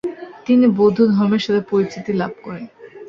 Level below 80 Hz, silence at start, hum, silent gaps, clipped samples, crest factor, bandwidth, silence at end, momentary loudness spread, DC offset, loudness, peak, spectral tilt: -58 dBFS; 0.05 s; none; none; under 0.1%; 14 dB; 7.2 kHz; 0 s; 18 LU; under 0.1%; -17 LUFS; -4 dBFS; -7.5 dB/octave